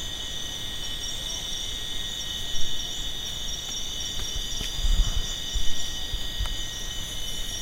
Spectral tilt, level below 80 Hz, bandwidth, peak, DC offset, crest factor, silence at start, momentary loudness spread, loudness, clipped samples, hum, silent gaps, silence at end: -1.5 dB/octave; -32 dBFS; 16 kHz; -10 dBFS; under 0.1%; 16 dB; 0 s; 3 LU; -30 LUFS; under 0.1%; none; none; 0 s